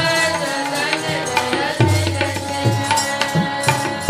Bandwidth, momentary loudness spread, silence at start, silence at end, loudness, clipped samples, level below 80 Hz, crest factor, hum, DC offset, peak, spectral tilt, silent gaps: 15.5 kHz; 4 LU; 0 s; 0 s; -18 LUFS; under 0.1%; -50 dBFS; 18 dB; none; under 0.1%; 0 dBFS; -4 dB/octave; none